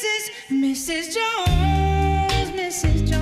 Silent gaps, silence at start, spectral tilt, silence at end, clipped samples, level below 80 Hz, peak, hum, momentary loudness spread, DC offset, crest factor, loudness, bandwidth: none; 0 s; -4.5 dB/octave; 0 s; under 0.1%; -26 dBFS; -8 dBFS; none; 5 LU; under 0.1%; 12 dB; -21 LUFS; 15 kHz